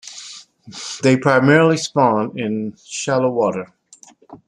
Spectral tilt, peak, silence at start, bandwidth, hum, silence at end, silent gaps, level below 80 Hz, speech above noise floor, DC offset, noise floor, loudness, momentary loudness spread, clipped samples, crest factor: -5.5 dB/octave; -2 dBFS; 0.05 s; 11.5 kHz; none; 0.1 s; none; -62 dBFS; 31 dB; under 0.1%; -48 dBFS; -17 LUFS; 21 LU; under 0.1%; 16 dB